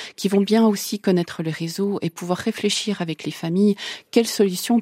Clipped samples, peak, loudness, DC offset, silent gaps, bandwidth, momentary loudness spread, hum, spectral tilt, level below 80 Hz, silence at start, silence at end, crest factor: under 0.1%; -4 dBFS; -22 LUFS; under 0.1%; none; 16 kHz; 9 LU; none; -5 dB/octave; -68 dBFS; 0 s; 0 s; 18 dB